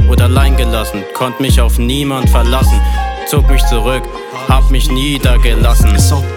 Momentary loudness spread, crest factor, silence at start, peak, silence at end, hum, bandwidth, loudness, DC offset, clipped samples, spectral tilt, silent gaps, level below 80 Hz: 8 LU; 10 dB; 0 s; 0 dBFS; 0 s; none; 17.5 kHz; -12 LUFS; under 0.1%; under 0.1%; -5.5 dB/octave; none; -12 dBFS